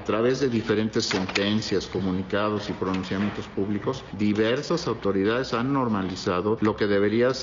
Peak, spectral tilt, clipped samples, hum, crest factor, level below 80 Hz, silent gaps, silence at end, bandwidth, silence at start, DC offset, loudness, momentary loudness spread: -6 dBFS; -5.5 dB/octave; under 0.1%; none; 20 dB; -52 dBFS; none; 0 s; 7.6 kHz; 0 s; under 0.1%; -25 LUFS; 5 LU